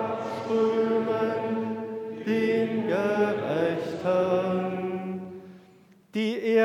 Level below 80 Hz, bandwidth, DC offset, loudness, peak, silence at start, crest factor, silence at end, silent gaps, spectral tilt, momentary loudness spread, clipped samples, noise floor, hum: -74 dBFS; 12.5 kHz; under 0.1%; -27 LUFS; -10 dBFS; 0 s; 16 dB; 0 s; none; -7 dB/octave; 10 LU; under 0.1%; -56 dBFS; none